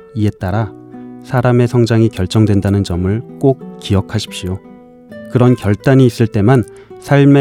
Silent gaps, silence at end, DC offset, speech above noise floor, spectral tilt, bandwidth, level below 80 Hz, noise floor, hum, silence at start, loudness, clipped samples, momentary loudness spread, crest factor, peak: none; 0 s; under 0.1%; 23 dB; -7.5 dB/octave; 14 kHz; -46 dBFS; -36 dBFS; none; 0.15 s; -14 LUFS; under 0.1%; 15 LU; 14 dB; 0 dBFS